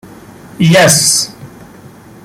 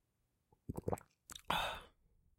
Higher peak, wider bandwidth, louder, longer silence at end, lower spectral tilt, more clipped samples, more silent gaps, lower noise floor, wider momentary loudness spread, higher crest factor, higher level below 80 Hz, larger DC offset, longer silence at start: first, 0 dBFS vs -20 dBFS; about the same, 16.5 kHz vs 16.5 kHz; first, -8 LUFS vs -42 LUFS; first, 0.75 s vs 0.5 s; about the same, -3 dB/octave vs -4 dB/octave; neither; neither; second, -36 dBFS vs -83 dBFS; second, 9 LU vs 16 LU; second, 14 dB vs 26 dB; first, -48 dBFS vs -62 dBFS; neither; about the same, 0.6 s vs 0.7 s